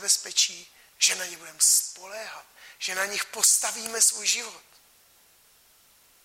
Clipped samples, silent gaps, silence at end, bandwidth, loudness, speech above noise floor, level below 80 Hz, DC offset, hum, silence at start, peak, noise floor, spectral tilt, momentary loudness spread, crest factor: under 0.1%; none; 1.65 s; 16.5 kHz; -22 LUFS; 32 dB; -78 dBFS; under 0.1%; none; 0 s; -6 dBFS; -59 dBFS; 3 dB/octave; 19 LU; 22 dB